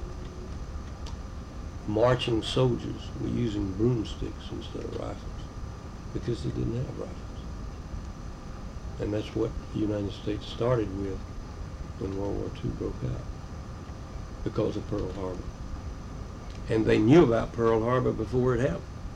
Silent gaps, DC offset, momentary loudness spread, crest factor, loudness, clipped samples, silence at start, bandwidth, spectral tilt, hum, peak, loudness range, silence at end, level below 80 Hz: none; under 0.1%; 16 LU; 22 dB; -30 LUFS; under 0.1%; 0 s; 10.5 kHz; -7 dB/octave; none; -8 dBFS; 10 LU; 0 s; -40 dBFS